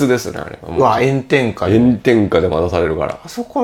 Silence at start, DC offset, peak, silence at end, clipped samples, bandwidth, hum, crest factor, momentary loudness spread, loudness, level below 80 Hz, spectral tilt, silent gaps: 0 s; under 0.1%; 0 dBFS; 0 s; under 0.1%; 16 kHz; none; 14 dB; 10 LU; -15 LUFS; -38 dBFS; -6.5 dB/octave; none